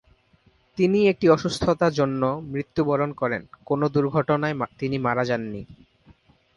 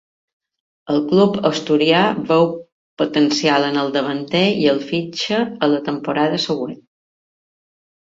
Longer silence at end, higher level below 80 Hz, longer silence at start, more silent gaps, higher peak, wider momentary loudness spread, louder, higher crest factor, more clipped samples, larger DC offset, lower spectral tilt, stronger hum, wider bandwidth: second, 0.8 s vs 1.45 s; first, -52 dBFS vs -60 dBFS; about the same, 0.75 s vs 0.85 s; second, none vs 2.72-2.97 s; second, -6 dBFS vs -2 dBFS; about the same, 9 LU vs 7 LU; second, -23 LUFS vs -18 LUFS; about the same, 18 dB vs 18 dB; neither; neither; first, -7 dB/octave vs -5.5 dB/octave; neither; first, 11.5 kHz vs 7.8 kHz